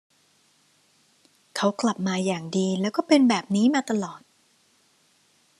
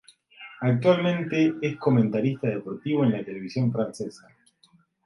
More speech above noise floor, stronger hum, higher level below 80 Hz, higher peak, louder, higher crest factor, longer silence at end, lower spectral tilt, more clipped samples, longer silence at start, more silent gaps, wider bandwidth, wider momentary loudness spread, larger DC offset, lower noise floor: about the same, 40 dB vs 38 dB; neither; second, -74 dBFS vs -68 dBFS; about the same, -6 dBFS vs -6 dBFS; about the same, -24 LUFS vs -25 LUFS; about the same, 20 dB vs 20 dB; first, 1.4 s vs 0.9 s; second, -5 dB/octave vs -8 dB/octave; neither; first, 1.55 s vs 0.4 s; neither; about the same, 12 kHz vs 11.5 kHz; about the same, 9 LU vs 11 LU; neither; about the same, -63 dBFS vs -62 dBFS